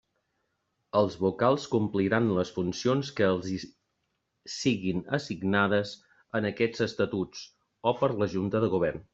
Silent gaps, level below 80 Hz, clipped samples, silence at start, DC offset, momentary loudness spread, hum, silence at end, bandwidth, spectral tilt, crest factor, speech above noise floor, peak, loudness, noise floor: none; -64 dBFS; under 0.1%; 0.95 s; under 0.1%; 11 LU; none; 0.1 s; 8 kHz; -6 dB/octave; 20 dB; 51 dB; -8 dBFS; -28 LUFS; -79 dBFS